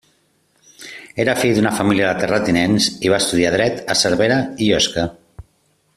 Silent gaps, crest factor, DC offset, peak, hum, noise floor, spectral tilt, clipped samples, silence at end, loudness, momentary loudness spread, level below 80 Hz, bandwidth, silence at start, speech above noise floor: none; 16 dB; under 0.1%; -2 dBFS; none; -62 dBFS; -4 dB/octave; under 0.1%; 0.55 s; -17 LUFS; 10 LU; -48 dBFS; 14 kHz; 0.8 s; 45 dB